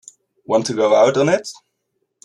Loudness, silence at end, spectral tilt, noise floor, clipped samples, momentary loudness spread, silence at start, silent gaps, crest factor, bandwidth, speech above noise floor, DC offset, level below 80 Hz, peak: -16 LUFS; 0.75 s; -5 dB/octave; -72 dBFS; under 0.1%; 8 LU; 0.5 s; none; 16 dB; 11.5 kHz; 56 dB; under 0.1%; -64 dBFS; -2 dBFS